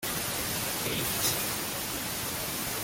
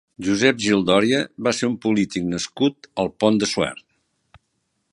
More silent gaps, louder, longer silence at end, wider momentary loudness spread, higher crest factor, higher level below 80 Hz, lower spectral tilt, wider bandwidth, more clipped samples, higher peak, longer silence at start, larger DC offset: neither; second, -30 LUFS vs -21 LUFS; second, 0 s vs 1.15 s; second, 5 LU vs 9 LU; about the same, 18 dB vs 20 dB; about the same, -52 dBFS vs -54 dBFS; second, -2 dB/octave vs -4.5 dB/octave; first, 17 kHz vs 11.5 kHz; neither; second, -14 dBFS vs -2 dBFS; second, 0 s vs 0.2 s; neither